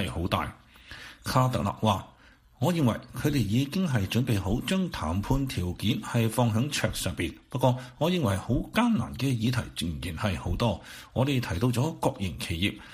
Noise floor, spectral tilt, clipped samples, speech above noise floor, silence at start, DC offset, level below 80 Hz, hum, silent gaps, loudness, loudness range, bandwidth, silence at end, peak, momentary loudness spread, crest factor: -50 dBFS; -6 dB/octave; under 0.1%; 22 dB; 0 s; under 0.1%; -44 dBFS; none; none; -28 LUFS; 2 LU; 15.5 kHz; 0 s; -8 dBFS; 7 LU; 20 dB